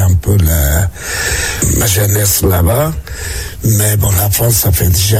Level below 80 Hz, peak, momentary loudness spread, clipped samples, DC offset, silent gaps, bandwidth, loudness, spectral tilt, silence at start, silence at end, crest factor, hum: -20 dBFS; -2 dBFS; 7 LU; under 0.1%; under 0.1%; none; 17 kHz; -12 LUFS; -4 dB/octave; 0 s; 0 s; 10 dB; none